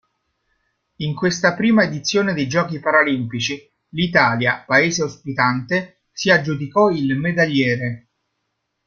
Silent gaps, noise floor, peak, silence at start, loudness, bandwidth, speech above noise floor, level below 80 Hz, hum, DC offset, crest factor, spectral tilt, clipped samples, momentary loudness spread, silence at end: none; -74 dBFS; -2 dBFS; 1 s; -18 LUFS; 7.4 kHz; 56 dB; -56 dBFS; none; under 0.1%; 18 dB; -5 dB/octave; under 0.1%; 9 LU; 0.9 s